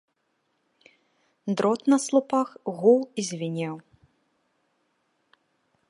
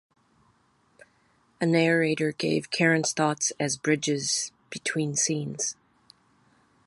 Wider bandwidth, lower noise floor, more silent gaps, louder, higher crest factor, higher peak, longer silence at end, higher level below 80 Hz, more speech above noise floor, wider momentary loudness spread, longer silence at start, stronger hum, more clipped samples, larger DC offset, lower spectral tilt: about the same, 11.5 kHz vs 11.5 kHz; first, -74 dBFS vs -66 dBFS; neither; about the same, -25 LUFS vs -26 LUFS; about the same, 20 dB vs 20 dB; about the same, -6 dBFS vs -8 dBFS; first, 2.1 s vs 1.15 s; second, -78 dBFS vs -72 dBFS; first, 50 dB vs 40 dB; first, 12 LU vs 8 LU; second, 1.45 s vs 1.6 s; neither; neither; neither; first, -5.5 dB/octave vs -3.5 dB/octave